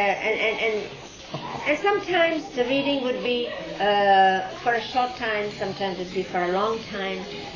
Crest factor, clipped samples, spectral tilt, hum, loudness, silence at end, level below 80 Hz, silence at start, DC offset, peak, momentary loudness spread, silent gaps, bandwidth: 16 dB; under 0.1%; -4.5 dB/octave; none; -24 LUFS; 0 s; -56 dBFS; 0 s; under 0.1%; -8 dBFS; 11 LU; none; 7.4 kHz